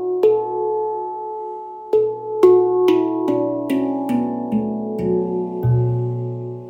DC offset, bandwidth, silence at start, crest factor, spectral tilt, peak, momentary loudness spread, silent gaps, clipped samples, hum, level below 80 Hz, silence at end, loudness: under 0.1%; 15.5 kHz; 0 s; 18 dB; -9.5 dB/octave; -2 dBFS; 12 LU; none; under 0.1%; none; -50 dBFS; 0 s; -19 LUFS